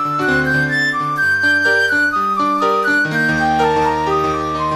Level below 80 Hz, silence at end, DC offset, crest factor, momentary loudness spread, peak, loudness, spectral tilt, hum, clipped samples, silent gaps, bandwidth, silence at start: -42 dBFS; 0 s; 0.1%; 14 dB; 4 LU; -2 dBFS; -15 LUFS; -5 dB/octave; none; under 0.1%; none; 13 kHz; 0 s